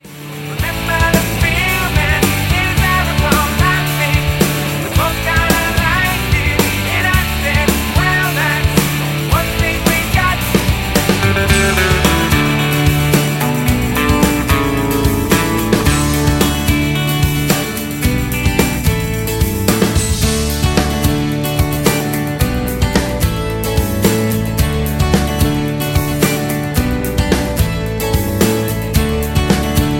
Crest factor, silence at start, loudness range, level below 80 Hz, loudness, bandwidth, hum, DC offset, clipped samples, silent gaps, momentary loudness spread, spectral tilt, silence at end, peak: 14 dB; 0.05 s; 3 LU; -22 dBFS; -14 LUFS; 17 kHz; none; under 0.1%; under 0.1%; none; 4 LU; -4.5 dB/octave; 0 s; 0 dBFS